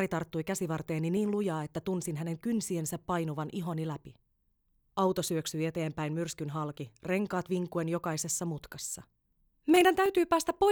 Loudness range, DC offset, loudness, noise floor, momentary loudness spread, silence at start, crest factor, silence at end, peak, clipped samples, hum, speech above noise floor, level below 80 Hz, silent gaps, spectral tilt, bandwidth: 5 LU; under 0.1%; -32 LUFS; -74 dBFS; 12 LU; 0 s; 20 dB; 0 s; -12 dBFS; under 0.1%; none; 43 dB; -64 dBFS; none; -5 dB/octave; over 20 kHz